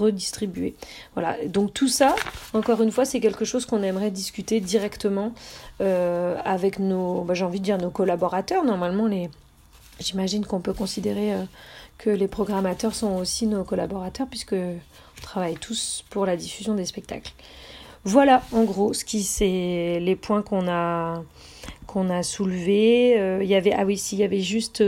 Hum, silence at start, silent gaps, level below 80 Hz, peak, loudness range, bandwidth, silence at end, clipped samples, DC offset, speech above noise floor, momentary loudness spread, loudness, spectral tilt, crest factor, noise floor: none; 0 s; none; -50 dBFS; -4 dBFS; 6 LU; 16 kHz; 0 s; under 0.1%; under 0.1%; 27 dB; 14 LU; -24 LUFS; -5 dB/octave; 20 dB; -51 dBFS